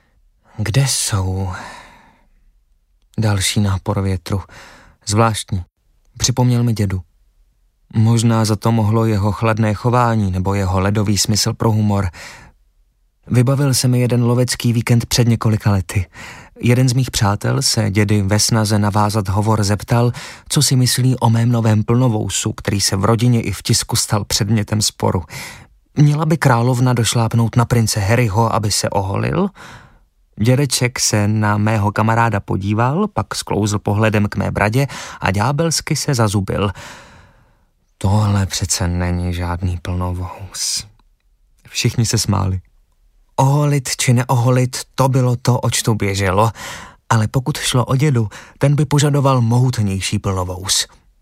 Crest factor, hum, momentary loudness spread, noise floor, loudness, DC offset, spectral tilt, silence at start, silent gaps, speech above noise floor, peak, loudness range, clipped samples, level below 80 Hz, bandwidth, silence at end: 16 dB; none; 8 LU; -58 dBFS; -16 LUFS; under 0.1%; -5 dB/octave; 0.6 s; none; 42 dB; 0 dBFS; 5 LU; under 0.1%; -40 dBFS; 16 kHz; 0.35 s